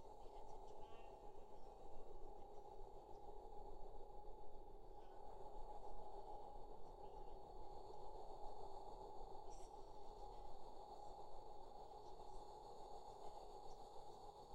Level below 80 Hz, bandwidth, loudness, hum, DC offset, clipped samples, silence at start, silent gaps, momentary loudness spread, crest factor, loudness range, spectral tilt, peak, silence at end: -60 dBFS; 9 kHz; -60 LUFS; none; under 0.1%; under 0.1%; 0 s; none; 4 LU; 14 dB; 2 LU; -5.5 dB/octave; -38 dBFS; 0 s